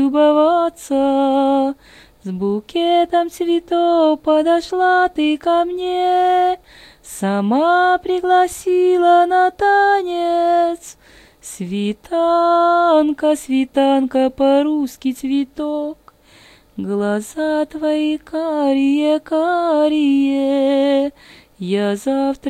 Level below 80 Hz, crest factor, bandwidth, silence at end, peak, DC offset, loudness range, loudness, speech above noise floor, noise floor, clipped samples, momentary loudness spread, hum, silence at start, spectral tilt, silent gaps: -54 dBFS; 14 dB; 14 kHz; 0 s; -4 dBFS; under 0.1%; 5 LU; -16 LUFS; 32 dB; -47 dBFS; under 0.1%; 9 LU; none; 0 s; -5 dB/octave; none